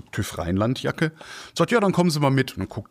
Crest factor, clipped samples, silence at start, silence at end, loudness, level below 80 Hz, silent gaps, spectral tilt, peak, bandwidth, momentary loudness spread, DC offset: 18 dB; under 0.1%; 0.15 s; 0.05 s; -23 LUFS; -50 dBFS; none; -6 dB/octave; -6 dBFS; 15.5 kHz; 11 LU; under 0.1%